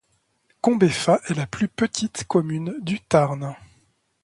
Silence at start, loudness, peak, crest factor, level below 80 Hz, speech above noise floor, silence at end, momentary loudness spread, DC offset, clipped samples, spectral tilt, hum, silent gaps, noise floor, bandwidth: 0.65 s; -22 LUFS; -4 dBFS; 20 dB; -56 dBFS; 46 dB; 0.7 s; 9 LU; under 0.1%; under 0.1%; -5.5 dB/octave; none; none; -68 dBFS; 11.5 kHz